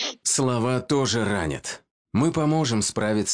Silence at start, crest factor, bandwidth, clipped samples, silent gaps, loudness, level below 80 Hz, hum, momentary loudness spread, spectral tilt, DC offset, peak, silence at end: 0 s; 12 dB; 10 kHz; under 0.1%; 1.91-2.05 s; -23 LUFS; -50 dBFS; none; 8 LU; -4 dB/octave; under 0.1%; -12 dBFS; 0 s